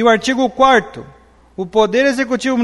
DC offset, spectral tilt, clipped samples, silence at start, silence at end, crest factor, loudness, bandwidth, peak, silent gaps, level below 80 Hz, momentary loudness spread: under 0.1%; -4 dB/octave; under 0.1%; 0 s; 0 s; 14 dB; -14 LUFS; 11.5 kHz; 0 dBFS; none; -46 dBFS; 20 LU